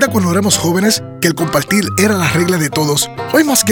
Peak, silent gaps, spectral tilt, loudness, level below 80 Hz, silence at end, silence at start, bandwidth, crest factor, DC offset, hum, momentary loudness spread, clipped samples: 0 dBFS; none; -4 dB/octave; -13 LUFS; -46 dBFS; 0 s; 0 s; over 20 kHz; 14 dB; under 0.1%; none; 3 LU; under 0.1%